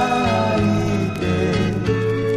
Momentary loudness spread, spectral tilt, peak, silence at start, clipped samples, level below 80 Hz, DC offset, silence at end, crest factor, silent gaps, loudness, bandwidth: 3 LU; -6.5 dB/octave; -6 dBFS; 0 s; under 0.1%; -36 dBFS; under 0.1%; 0 s; 12 dB; none; -19 LUFS; 13.5 kHz